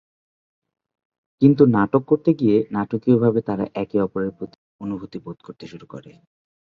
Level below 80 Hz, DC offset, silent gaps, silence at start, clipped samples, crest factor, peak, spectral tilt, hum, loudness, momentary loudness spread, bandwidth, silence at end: -58 dBFS; under 0.1%; 4.55-4.79 s; 1.4 s; under 0.1%; 20 dB; -2 dBFS; -10.5 dB/octave; none; -20 LUFS; 22 LU; 6 kHz; 0.65 s